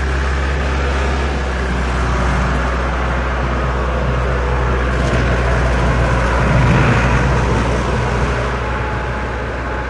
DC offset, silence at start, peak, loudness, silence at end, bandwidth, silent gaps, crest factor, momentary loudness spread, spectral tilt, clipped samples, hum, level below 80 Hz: under 0.1%; 0 s; -2 dBFS; -17 LUFS; 0 s; 10.5 kHz; none; 14 dB; 6 LU; -6.5 dB/octave; under 0.1%; none; -20 dBFS